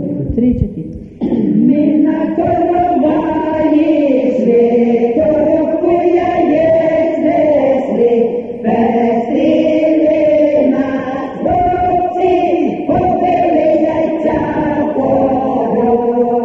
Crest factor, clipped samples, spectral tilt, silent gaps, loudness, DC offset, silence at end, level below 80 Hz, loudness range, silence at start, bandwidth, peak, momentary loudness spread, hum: 12 dB; under 0.1%; -9 dB/octave; none; -13 LUFS; 0.1%; 0 s; -38 dBFS; 2 LU; 0 s; 6.8 kHz; 0 dBFS; 5 LU; none